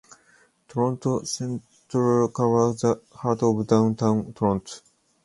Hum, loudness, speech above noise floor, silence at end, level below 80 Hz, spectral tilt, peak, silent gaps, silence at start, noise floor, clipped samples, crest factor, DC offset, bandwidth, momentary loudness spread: none; -24 LUFS; 37 dB; 0.45 s; -56 dBFS; -7 dB/octave; -4 dBFS; none; 0.75 s; -60 dBFS; under 0.1%; 20 dB; under 0.1%; 11.5 kHz; 11 LU